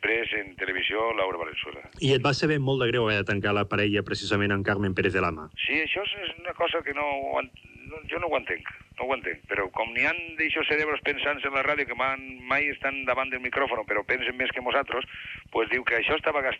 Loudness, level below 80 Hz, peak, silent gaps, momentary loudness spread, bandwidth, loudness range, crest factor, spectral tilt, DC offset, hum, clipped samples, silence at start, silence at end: -26 LUFS; -54 dBFS; -10 dBFS; none; 8 LU; 9.6 kHz; 4 LU; 18 dB; -5.5 dB/octave; under 0.1%; none; under 0.1%; 0 s; 0 s